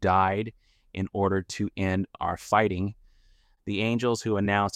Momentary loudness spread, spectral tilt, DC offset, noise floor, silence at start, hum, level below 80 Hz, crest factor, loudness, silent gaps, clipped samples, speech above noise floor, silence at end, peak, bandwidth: 11 LU; -6 dB/octave; under 0.1%; -61 dBFS; 0 s; none; -54 dBFS; 20 dB; -27 LUFS; none; under 0.1%; 35 dB; 0.05 s; -8 dBFS; 14 kHz